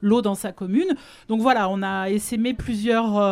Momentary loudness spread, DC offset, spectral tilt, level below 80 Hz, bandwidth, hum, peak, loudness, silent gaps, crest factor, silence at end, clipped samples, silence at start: 7 LU; under 0.1%; -5.5 dB/octave; -48 dBFS; 15.5 kHz; none; -6 dBFS; -23 LUFS; none; 16 dB; 0 s; under 0.1%; 0 s